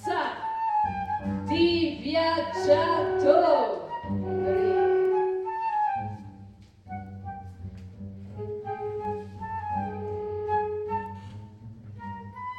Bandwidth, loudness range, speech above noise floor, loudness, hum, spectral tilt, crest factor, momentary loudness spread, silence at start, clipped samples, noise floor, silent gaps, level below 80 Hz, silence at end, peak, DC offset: 9.2 kHz; 12 LU; 26 dB; -27 LUFS; none; -7 dB/octave; 22 dB; 19 LU; 0 s; under 0.1%; -49 dBFS; none; -56 dBFS; 0 s; -6 dBFS; under 0.1%